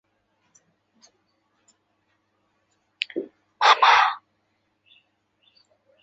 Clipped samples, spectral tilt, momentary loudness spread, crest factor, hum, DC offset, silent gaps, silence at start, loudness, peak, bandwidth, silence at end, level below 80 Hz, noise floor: under 0.1%; 0 dB/octave; 22 LU; 24 dB; none; under 0.1%; none; 3.15 s; -19 LUFS; -2 dBFS; 8 kHz; 1.85 s; -74 dBFS; -72 dBFS